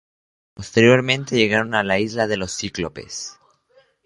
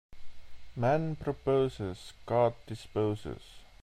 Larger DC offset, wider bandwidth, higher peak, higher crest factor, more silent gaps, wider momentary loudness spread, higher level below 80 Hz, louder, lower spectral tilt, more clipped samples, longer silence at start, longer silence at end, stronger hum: neither; second, 11.5 kHz vs 13.5 kHz; first, -2 dBFS vs -14 dBFS; about the same, 20 dB vs 18 dB; neither; about the same, 17 LU vs 16 LU; about the same, -50 dBFS vs -54 dBFS; first, -19 LUFS vs -32 LUFS; second, -4.5 dB/octave vs -7.5 dB/octave; neither; first, 0.6 s vs 0.1 s; first, 0.75 s vs 0.15 s; neither